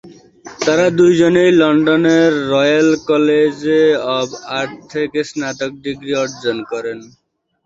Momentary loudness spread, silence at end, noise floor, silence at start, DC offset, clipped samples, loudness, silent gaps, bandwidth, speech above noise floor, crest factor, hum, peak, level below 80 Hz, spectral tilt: 12 LU; 0.6 s; -38 dBFS; 0.05 s; under 0.1%; under 0.1%; -14 LUFS; none; 8 kHz; 24 dB; 14 dB; none; -2 dBFS; -56 dBFS; -5 dB/octave